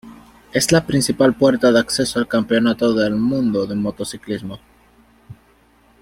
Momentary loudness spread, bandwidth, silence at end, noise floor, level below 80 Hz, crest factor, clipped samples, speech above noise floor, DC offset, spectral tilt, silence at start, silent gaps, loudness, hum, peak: 13 LU; 16.5 kHz; 0.7 s; -54 dBFS; -50 dBFS; 18 dB; under 0.1%; 37 dB; under 0.1%; -4.5 dB/octave; 0.05 s; none; -18 LUFS; none; -2 dBFS